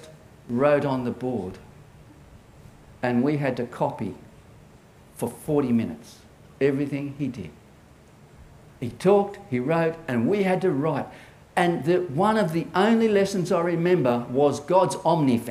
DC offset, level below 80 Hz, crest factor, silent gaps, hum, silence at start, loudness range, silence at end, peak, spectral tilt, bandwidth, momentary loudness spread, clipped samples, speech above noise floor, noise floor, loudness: under 0.1%; -58 dBFS; 20 dB; none; none; 0 s; 8 LU; 0 s; -6 dBFS; -7 dB/octave; 15.5 kHz; 12 LU; under 0.1%; 28 dB; -51 dBFS; -24 LUFS